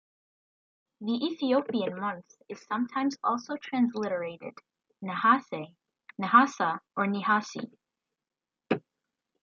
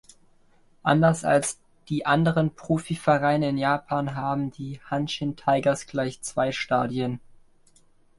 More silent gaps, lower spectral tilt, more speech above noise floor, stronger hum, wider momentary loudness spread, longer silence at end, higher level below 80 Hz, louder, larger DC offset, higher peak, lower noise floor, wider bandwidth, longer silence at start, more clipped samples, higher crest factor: neither; about the same, -5.5 dB/octave vs -5.5 dB/octave; first, 61 dB vs 34 dB; neither; first, 20 LU vs 10 LU; second, 0.65 s vs 1 s; second, -80 dBFS vs -56 dBFS; second, -28 LUFS vs -25 LUFS; neither; about the same, -6 dBFS vs -6 dBFS; first, -90 dBFS vs -58 dBFS; second, 7.4 kHz vs 11.5 kHz; first, 1 s vs 0.85 s; neither; about the same, 24 dB vs 20 dB